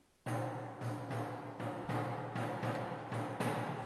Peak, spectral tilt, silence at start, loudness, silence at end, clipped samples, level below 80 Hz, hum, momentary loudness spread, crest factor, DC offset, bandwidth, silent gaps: -24 dBFS; -6.5 dB/octave; 0.25 s; -41 LUFS; 0 s; under 0.1%; -72 dBFS; none; 5 LU; 16 dB; under 0.1%; 13 kHz; none